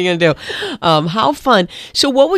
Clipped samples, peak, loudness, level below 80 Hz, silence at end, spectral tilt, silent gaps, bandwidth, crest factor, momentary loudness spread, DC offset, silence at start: under 0.1%; 0 dBFS; -14 LUFS; -48 dBFS; 0 s; -4.5 dB/octave; none; 15 kHz; 14 dB; 7 LU; under 0.1%; 0 s